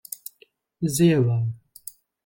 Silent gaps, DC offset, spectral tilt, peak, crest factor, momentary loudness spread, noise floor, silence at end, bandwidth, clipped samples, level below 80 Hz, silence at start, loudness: none; under 0.1%; -6.5 dB/octave; -8 dBFS; 18 dB; 22 LU; -60 dBFS; 0.7 s; 17 kHz; under 0.1%; -60 dBFS; 0.8 s; -22 LUFS